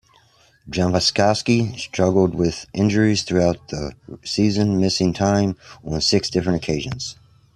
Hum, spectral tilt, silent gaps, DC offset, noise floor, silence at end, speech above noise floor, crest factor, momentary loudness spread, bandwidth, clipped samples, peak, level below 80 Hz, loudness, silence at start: none; -5 dB/octave; none; under 0.1%; -55 dBFS; 0.4 s; 36 dB; 18 dB; 12 LU; 12 kHz; under 0.1%; -2 dBFS; -46 dBFS; -20 LUFS; 0.65 s